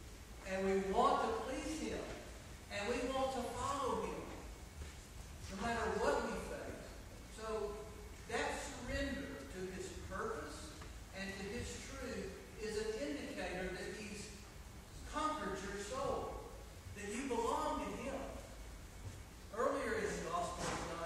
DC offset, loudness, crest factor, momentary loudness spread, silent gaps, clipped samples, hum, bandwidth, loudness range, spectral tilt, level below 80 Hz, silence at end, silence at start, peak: under 0.1%; -42 LUFS; 22 dB; 15 LU; none; under 0.1%; none; 16 kHz; 6 LU; -4.5 dB/octave; -54 dBFS; 0 s; 0 s; -20 dBFS